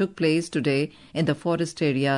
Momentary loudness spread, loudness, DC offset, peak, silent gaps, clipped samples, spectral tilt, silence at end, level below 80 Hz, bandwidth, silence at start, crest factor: 4 LU; -25 LUFS; under 0.1%; -10 dBFS; none; under 0.1%; -6 dB/octave; 0 s; -62 dBFS; 11 kHz; 0 s; 14 dB